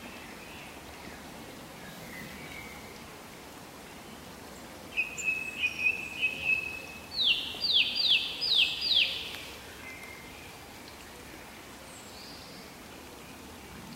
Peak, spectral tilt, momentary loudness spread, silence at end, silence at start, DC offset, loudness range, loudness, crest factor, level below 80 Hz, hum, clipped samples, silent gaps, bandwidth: -12 dBFS; -1 dB/octave; 22 LU; 0 s; 0 s; under 0.1%; 19 LU; -27 LUFS; 22 dB; -60 dBFS; none; under 0.1%; none; 16 kHz